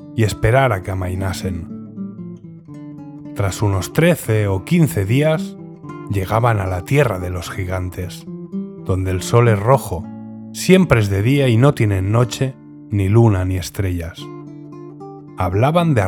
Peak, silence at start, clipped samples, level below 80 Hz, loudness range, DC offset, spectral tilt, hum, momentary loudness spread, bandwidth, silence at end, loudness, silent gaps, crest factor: 0 dBFS; 0 s; under 0.1%; -40 dBFS; 6 LU; under 0.1%; -6.5 dB/octave; none; 20 LU; 18 kHz; 0 s; -17 LUFS; none; 18 dB